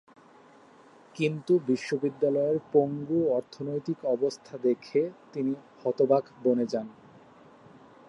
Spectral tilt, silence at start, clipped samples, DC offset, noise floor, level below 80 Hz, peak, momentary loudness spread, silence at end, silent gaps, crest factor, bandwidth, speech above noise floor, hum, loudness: -7 dB/octave; 1.15 s; under 0.1%; under 0.1%; -55 dBFS; -74 dBFS; -10 dBFS; 8 LU; 1.15 s; none; 20 dB; 10.5 kHz; 28 dB; none; -28 LUFS